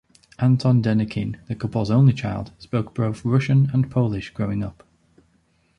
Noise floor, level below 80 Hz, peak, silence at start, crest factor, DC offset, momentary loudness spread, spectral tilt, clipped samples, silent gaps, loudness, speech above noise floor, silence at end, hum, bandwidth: -63 dBFS; -48 dBFS; -6 dBFS; 0.4 s; 16 dB; under 0.1%; 11 LU; -8.5 dB/octave; under 0.1%; none; -22 LUFS; 43 dB; 1.05 s; none; 9.4 kHz